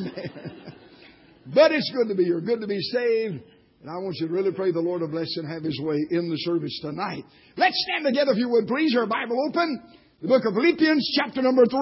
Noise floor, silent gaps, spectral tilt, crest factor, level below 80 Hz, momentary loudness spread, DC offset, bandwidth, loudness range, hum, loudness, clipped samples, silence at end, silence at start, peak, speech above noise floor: -51 dBFS; none; -9 dB/octave; 18 dB; -68 dBFS; 15 LU; under 0.1%; 5.8 kHz; 5 LU; none; -24 LUFS; under 0.1%; 0 s; 0 s; -6 dBFS; 28 dB